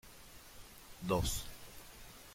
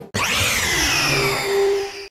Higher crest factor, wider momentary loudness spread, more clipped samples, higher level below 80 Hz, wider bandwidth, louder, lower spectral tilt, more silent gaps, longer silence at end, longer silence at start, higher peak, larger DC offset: first, 24 dB vs 12 dB; first, 19 LU vs 4 LU; neither; second, -50 dBFS vs -40 dBFS; about the same, 16.5 kHz vs 16.5 kHz; second, -38 LUFS vs -18 LUFS; first, -4 dB/octave vs -2 dB/octave; neither; about the same, 0 s vs 0 s; about the same, 0.05 s vs 0 s; second, -20 dBFS vs -8 dBFS; neither